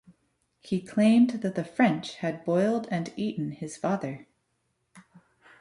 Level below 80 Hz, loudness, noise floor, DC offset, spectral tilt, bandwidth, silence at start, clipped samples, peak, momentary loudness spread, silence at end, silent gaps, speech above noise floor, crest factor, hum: -68 dBFS; -27 LUFS; -76 dBFS; under 0.1%; -6.5 dB/octave; 11.5 kHz; 0.65 s; under 0.1%; -10 dBFS; 11 LU; 0.6 s; none; 49 dB; 18 dB; none